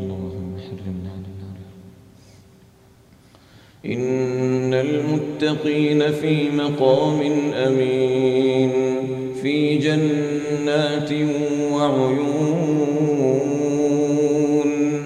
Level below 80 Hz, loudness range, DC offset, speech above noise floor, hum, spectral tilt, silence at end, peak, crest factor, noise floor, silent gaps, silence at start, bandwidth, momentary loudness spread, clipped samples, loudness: -58 dBFS; 13 LU; under 0.1%; 32 dB; none; -6.5 dB/octave; 0 s; -4 dBFS; 16 dB; -51 dBFS; none; 0 s; 9.8 kHz; 13 LU; under 0.1%; -20 LUFS